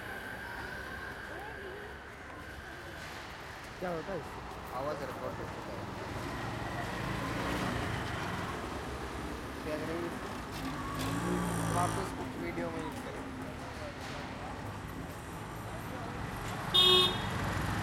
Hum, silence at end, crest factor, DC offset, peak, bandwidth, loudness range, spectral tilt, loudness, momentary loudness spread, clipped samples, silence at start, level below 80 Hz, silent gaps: none; 0 s; 22 dB; under 0.1%; -14 dBFS; 16.5 kHz; 12 LU; -4 dB/octave; -35 LUFS; 11 LU; under 0.1%; 0 s; -50 dBFS; none